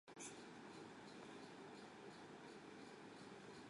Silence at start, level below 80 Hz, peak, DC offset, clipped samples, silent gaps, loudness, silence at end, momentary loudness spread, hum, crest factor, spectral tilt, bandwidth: 0.05 s; -88 dBFS; -42 dBFS; under 0.1%; under 0.1%; none; -58 LUFS; 0 s; 3 LU; none; 16 dB; -3.5 dB/octave; 11.5 kHz